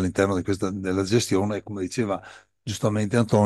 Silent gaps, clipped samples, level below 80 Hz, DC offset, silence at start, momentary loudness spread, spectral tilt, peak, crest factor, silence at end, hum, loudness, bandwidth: none; under 0.1%; -58 dBFS; under 0.1%; 0 s; 8 LU; -6 dB/octave; -6 dBFS; 18 dB; 0 s; none; -25 LUFS; 12.5 kHz